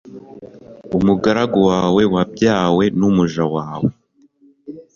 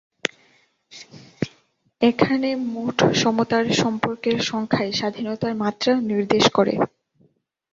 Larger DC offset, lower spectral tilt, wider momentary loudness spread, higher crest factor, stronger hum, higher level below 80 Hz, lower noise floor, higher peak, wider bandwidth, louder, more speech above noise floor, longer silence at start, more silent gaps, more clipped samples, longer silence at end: neither; first, -7 dB/octave vs -4.5 dB/octave; second, 8 LU vs 13 LU; second, 16 dB vs 22 dB; neither; first, -46 dBFS vs -58 dBFS; second, -53 dBFS vs -63 dBFS; about the same, -2 dBFS vs 0 dBFS; about the same, 7.2 kHz vs 7.8 kHz; first, -16 LUFS vs -21 LUFS; second, 38 dB vs 42 dB; second, 0.05 s vs 0.25 s; neither; neither; second, 0.15 s vs 0.85 s